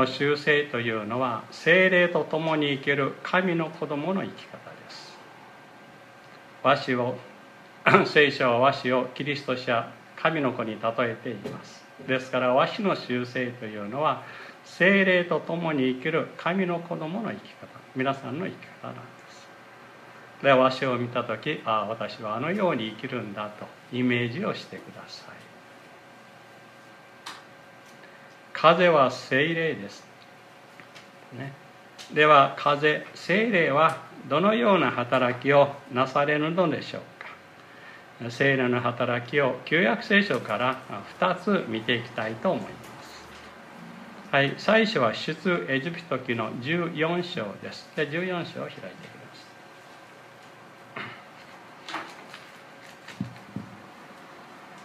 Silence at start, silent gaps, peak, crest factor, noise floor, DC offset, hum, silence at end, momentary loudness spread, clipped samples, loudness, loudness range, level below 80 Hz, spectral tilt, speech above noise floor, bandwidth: 0 s; none; -2 dBFS; 24 dB; -50 dBFS; under 0.1%; none; 0 s; 23 LU; under 0.1%; -25 LUFS; 13 LU; -74 dBFS; -6 dB/octave; 25 dB; 14 kHz